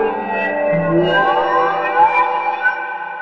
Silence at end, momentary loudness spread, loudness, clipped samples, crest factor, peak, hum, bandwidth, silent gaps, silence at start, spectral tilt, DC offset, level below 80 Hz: 0 s; 6 LU; -16 LUFS; under 0.1%; 14 dB; -2 dBFS; none; 6.6 kHz; none; 0 s; -7.5 dB/octave; under 0.1%; -54 dBFS